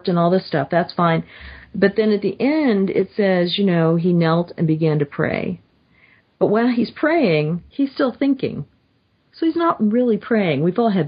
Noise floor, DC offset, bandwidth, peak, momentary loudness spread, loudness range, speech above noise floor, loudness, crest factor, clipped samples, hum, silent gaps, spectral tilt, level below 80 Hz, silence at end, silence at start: -62 dBFS; under 0.1%; 5.2 kHz; -2 dBFS; 7 LU; 2 LU; 44 dB; -19 LUFS; 16 dB; under 0.1%; none; none; -11.5 dB/octave; -54 dBFS; 0 s; 0.05 s